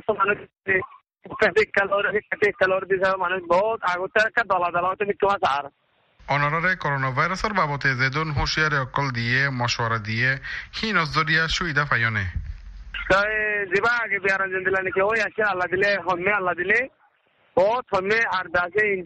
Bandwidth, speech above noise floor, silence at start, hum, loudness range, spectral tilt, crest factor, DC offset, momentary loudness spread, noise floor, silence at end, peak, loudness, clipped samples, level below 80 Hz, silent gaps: 8.8 kHz; 40 dB; 0.1 s; none; 1 LU; -5 dB/octave; 18 dB; under 0.1%; 5 LU; -63 dBFS; 0 s; -6 dBFS; -22 LUFS; under 0.1%; -44 dBFS; none